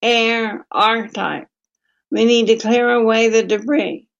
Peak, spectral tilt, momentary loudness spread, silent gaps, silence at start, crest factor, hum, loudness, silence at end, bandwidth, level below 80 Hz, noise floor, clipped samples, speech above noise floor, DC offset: -2 dBFS; -3.5 dB/octave; 10 LU; none; 0 s; 16 dB; none; -16 LUFS; 0.2 s; 7.6 kHz; -70 dBFS; -72 dBFS; under 0.1%; 56 dB; under 0.1%